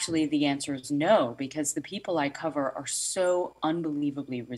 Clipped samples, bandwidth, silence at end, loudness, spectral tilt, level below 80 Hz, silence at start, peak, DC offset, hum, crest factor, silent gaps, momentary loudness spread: under 0.1%; 14 kHz; 0 s; -28 LUFS; -4 dB/octave; -70 dBFS; 0 s; -10 dBFS; under 0.1%; none; 18 dB; none; 8 LU